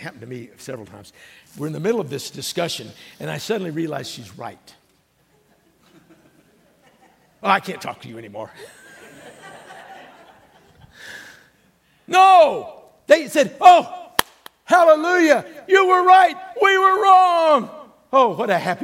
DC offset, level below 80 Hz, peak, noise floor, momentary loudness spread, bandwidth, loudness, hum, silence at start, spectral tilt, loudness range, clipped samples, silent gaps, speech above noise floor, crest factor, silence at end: under 0.1%; -64 dBFS; 0 dBFS; -61 dBFS; 24 LU; 16.5 kHz; -16 LUFS; none; 0 s; -4 dB/octave; 16 LU; under 0.1%; none; 44 dB; 20 dB; 0 s